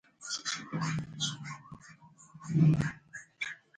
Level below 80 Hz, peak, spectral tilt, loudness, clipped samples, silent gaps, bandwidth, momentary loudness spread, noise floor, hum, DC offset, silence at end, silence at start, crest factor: -62 dBFS; -14 dBFS; -4.5 dB/octave; -33 LUFS; under 0.1%; none; 9.4 kHz; 22 LU; -56 dBFS; none; under 0.1%; 0.25 s; 0.2 s; 20 dB